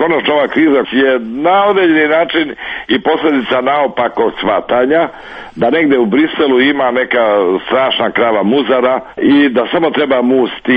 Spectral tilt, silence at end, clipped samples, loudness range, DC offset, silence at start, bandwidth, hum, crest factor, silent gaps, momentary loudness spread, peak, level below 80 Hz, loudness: -7.5 dB/octave; 0 s; under 0.1%; 2 LU; under 0.1%; 0 s; 5 kHz; none; 10 dB; none; 5 LU; 0 dBFS; -50 dBFS; -12 LUFS